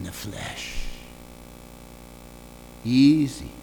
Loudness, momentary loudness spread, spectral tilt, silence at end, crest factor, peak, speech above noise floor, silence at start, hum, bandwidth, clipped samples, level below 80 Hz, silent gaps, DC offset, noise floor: -23 LUFS; 26 LU; -5.5 dB/octave; 0 s; 18 dB; -8 dBFS; 22 dB; 0 s; 60 Hz at -50 dBFS; over 20 kHz; under 0.1%; -42 dBFS; none; under 0.1%; -44 dBFS